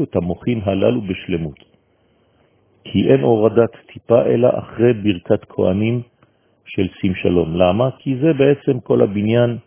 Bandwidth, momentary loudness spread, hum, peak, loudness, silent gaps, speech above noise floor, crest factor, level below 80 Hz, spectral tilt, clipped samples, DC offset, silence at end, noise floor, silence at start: 3.6 kHz; 9 LU; none; 0 dBFS; -17 LUFS; none; 42 dB; 16 dB; -42 dBFS; -12 dB/octave; under 0.1%; under 0.1%; 0.05 s; -59 dBFS; 0 s